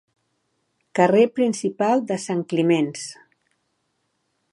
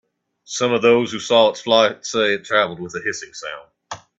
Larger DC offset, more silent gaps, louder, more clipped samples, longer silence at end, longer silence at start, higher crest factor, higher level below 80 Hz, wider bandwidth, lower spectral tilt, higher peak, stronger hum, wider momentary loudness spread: neither; neither; second, -21 LUFS vs -18 LUFS; neither; first, 1.4 s vs 0.25 s; first, 0.95 s vs 0.5 s; about the same, 20 dB vs 18 dB; second, -76 dBFS vs -64 dBFS; first, 11.5 kHz vs 8.2 kHz; first, -5.5 dB/octave vs -3 dB/octave; second, -4 dBFS vs 0 dBFS; neither; second, 12 LU vs 18 LU